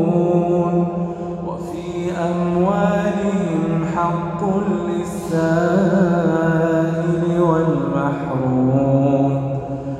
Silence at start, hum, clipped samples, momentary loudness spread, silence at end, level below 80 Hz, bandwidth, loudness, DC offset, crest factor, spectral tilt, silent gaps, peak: 0 s; none; under 0.1%; 8 LU; 0 s; -46 dBFS; 12 kHz; -19 LUFS; under 0.1%; 14 dB; -8.5 dB/octave; none; -2 dBFS